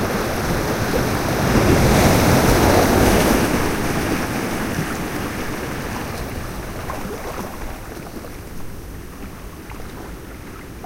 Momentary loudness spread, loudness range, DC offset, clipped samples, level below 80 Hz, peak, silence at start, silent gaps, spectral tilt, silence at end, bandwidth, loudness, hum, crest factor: 20 LU; 17 LU; under 0.1%; under 0.1%; -30 dBFS; -2 dBFS; 0 s; none; -5 dB/octave; 0 s; 16 kHz; -19 LUFS; none; 18 dB